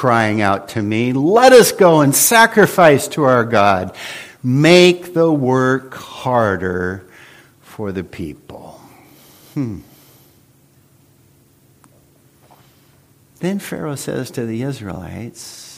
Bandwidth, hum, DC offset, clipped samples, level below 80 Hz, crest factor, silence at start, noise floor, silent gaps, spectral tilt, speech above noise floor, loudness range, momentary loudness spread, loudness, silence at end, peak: 16 kHz; none; under 0.1%; under 0.1%; -54 dBFS; 16 dB; 0 s; -52 dBFS; none; -4.5 dB/octave; 38 dB; 22 LU; 20 LU; -14 LUFS; 0.05 s; 0 dBFS